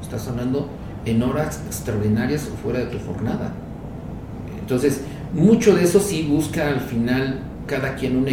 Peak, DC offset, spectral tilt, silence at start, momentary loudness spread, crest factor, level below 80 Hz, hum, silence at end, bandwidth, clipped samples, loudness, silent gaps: -2 dBFS; under 0.1%; -6 dB/octave; 0 s; 16 LU; 18 dB; -40 dBFS; none; 0 s; 17.5 kHz; under 0.1%; -21 LUFS; none